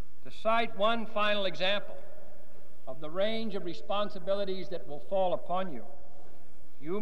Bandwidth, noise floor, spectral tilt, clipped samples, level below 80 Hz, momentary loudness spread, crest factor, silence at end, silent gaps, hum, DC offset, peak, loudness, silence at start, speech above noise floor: 14.5 kHz; -59 dBFS; -5.5 dB/octave; under 0.1%; -64 dBFS; 18 LU; 18 dB; 0 s; none; none; 5%; -14 dBFS; -32 LUFS; 0.25 s; 27 dB